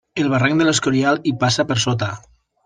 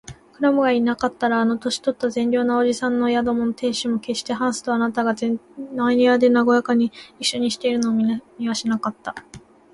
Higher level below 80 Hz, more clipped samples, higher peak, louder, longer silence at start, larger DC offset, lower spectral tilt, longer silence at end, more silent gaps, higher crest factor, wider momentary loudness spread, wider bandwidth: about the same, -54 dBFS vs -58 dBFS; neither; first, -2 dBFS vs -6 dBFS; first, -18 LUFS vs -21 LUFS; about the same, 0.15 s vs 0.1 s; neither; about the same, -4.5 dB/octave vs -4 dB/octave; first, 0.5 s vs 0.35 s; neither; about the same, 16 dB vs 16 dB; about the same, 7 LU vs 9 LU; second, 10 kHz vs 11.5 kHz